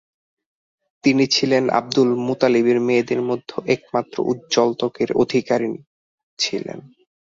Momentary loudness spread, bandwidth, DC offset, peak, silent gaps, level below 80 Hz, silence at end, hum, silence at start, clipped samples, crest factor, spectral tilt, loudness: 8 LU; 7.8 kHz; under 0.1%; -2 dBFS; 5.87-6.37 s; -62 dBFS; 0.55 s; none; 1.05 s; under 0.1%; 18 dB; -4.5 dB/octave; -20 LUFS